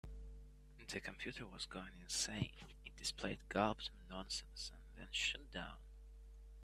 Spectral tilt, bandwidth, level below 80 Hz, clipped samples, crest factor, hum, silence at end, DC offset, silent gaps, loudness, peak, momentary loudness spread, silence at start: -3 dB/octave; 14.5 kHz; -58 dBFS; under 0.1%; 26 dB; none; 0 s; under 0.1%; none; -44 LUFS; -20 dBFS; 21 LU; 0.05 s